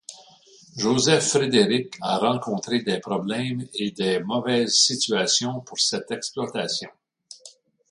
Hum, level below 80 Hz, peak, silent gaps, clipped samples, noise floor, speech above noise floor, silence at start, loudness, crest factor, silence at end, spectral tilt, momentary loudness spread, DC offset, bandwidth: none; -64 dBFS; -4 dBFS; none; under 0.1%; -52 dBFS; 29 dB; 0.1 s; -22 LUFS; 20 dB; 0.4 s; -3 dB/octave; 11 LU; under 0.1%; 11.5 kHz